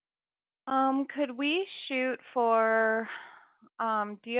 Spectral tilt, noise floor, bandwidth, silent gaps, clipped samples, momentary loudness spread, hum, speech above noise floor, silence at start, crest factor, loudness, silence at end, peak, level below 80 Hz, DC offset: -1 dB/octave; under -90 dBFS; 4 kHz; none; under 0.1%; 9 LU; none; over 61 dB; 0.65 s; 16 dB; -29 LUFS; 0 s; -14 dBFS; -82 dBFS; under 0.1%